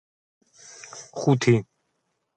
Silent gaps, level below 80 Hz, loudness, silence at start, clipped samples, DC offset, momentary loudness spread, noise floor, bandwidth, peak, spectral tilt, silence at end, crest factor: none; -64 dBFS; -22 LUFS; 0.95 s; under 0.1%; under 0.1%; 21 LU; -75 dBFS; 9 kHz; -6 dBFS; -6.5 dB/octave; 0.75 s; 20 dB